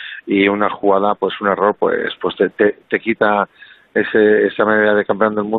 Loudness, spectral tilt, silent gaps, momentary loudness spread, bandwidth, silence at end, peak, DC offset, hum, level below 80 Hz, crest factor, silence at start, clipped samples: -16 LUFS; -9 dB/octave; none; 7 LU; 4.2 kHz; 0 s; -2 dBFS; under 0.1%; none; -58 dBFS; 14 dB; 0 s; under 0.1%